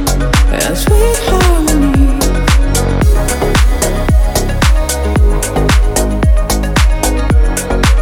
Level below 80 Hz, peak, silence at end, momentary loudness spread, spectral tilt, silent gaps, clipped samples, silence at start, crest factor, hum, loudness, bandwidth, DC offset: -12 dBFS; 0 dBFS; 0 s; 3 LU; -5 dB/octave; none; under 0.1%; 0 s; 10 dB; none; -12 LUFS; 17.5 kHz; under 0.1%